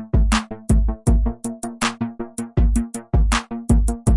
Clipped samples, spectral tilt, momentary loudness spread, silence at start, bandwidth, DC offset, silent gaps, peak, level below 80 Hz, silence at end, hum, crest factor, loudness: under 0.1%; -5.5 dB/octave; 9 LU; 0 s; 11.5 kHz; under 0.1%; none; -2 dBFS; -20 dBFS; 0 s; none; 16 dB; -21 LUFS